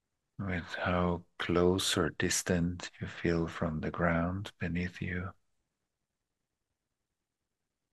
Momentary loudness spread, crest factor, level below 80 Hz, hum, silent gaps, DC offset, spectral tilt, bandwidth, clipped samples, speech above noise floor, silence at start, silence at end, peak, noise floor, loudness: 9 LU; 22 dB; -54 dBFS; none; none; under 0.1%; -4.5 dB/octave; 12.5 kHz; under 0.1%; 55 dB; 0.4 s; 2.6 s; -14 dBFS; -88 dBFS; -33 LUFS